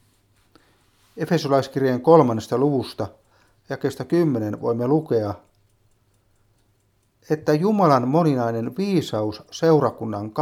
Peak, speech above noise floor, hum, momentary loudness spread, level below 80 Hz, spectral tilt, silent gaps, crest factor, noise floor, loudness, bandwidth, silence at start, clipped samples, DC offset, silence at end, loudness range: 0 dBFS; 44 dB; none; 13 LU; -64 dBFS; -7.5 dB/octave; none; 22 dB; -65 dBFS; -21 LUFS; 15.5 kHz; 1.15 s; under 0.1%; under 0.1%; 0 s; 5 LU